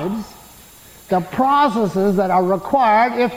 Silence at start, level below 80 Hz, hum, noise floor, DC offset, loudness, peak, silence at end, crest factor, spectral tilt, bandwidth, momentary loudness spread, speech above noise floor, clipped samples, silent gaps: 0 s; -52 dBFS; none; -43 dBFS; under 0.1%; -17 LUFS; -4 dBFS; 0 s; 12 dB; -6.5 dB/octave; 17 kHz; 10 LU; 27 dB; under 0.1%; none